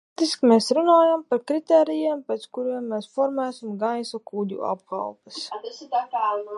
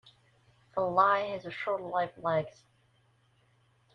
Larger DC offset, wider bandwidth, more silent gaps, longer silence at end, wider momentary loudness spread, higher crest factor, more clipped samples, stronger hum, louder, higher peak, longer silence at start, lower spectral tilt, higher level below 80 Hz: neither; first, 11.5 kHz vs 7.2 kHz; neither; second, 0 s vs 1.45 s; first, 14 LU vs 11 LU; about the same, 18 dB vs 22 dB; neither; neither; first, -23 LUFS vs -30 LUFS; first, -4 dBFS vs -12 dBFS; first, 0.2 s vs 0.05 s; second, -5 dB/octave vs -6.5 dB/octave; second, -80 dBFS vs -72 dBFS